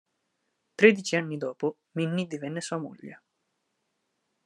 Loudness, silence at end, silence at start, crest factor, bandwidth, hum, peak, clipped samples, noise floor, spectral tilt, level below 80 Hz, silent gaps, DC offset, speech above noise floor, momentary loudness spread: -27 LUFS; 1.3 s; 0.8 s; 26 dB; 11 kHz; none; -2 dBFS; under 0.1%; -78 dBFS; -5 dB/octave; -82 dBFS; none; under 0.1%; 51 dB; 22 LU